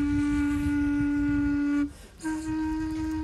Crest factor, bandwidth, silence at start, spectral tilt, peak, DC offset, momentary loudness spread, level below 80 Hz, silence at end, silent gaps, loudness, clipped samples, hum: 10 dB; 12 kHz; 0 s; -6.5 dB/octave; -16 dBFS; under 0.1%; 7 LU; -40 dBFS; 0 s; none; -28 LUFS; under 0.1%; none